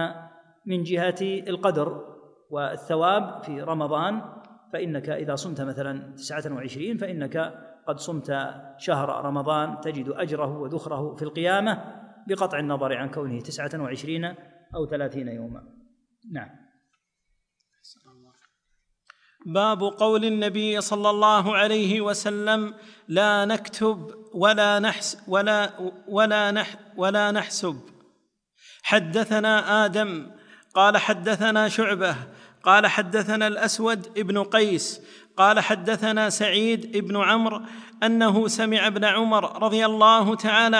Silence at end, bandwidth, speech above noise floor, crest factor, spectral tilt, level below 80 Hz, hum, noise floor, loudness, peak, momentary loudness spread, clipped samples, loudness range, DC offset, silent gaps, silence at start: 0 s; 10.5 kHz; 51 dB; 20 dB; -4 dB/octave; -66 dBFS; none; -75 dBFS; -23 LUFS; -4 dBFS; 15 LU; under 0.1%; 10 LU; under 0.1%; none; 0 s